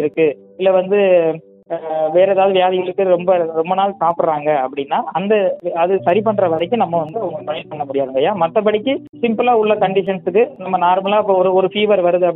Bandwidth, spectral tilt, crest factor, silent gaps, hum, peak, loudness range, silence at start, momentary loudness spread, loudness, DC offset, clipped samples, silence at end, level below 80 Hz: 4 kHz; -9.5 dB/octave; 14 dB; 9.09-9.13 s; none; -2 dBFS; 2 LU; 0 s; 7 LU; -16 LUFS; under 0.1%; under 0.1%; 0 s; -64 dBFS